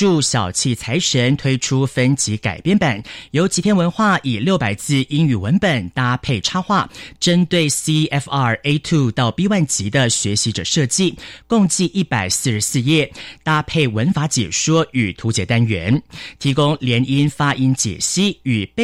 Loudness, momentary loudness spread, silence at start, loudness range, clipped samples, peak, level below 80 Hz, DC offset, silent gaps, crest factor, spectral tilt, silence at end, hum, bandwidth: -17 LUFS; 4 LU; 0 s; 1 LU; under 0.1%; -4 dBFS; -46 dBFS; under 0.1%; none; 12 dB; -4.5 dB/octave; 0 s; none; 15.5 kHz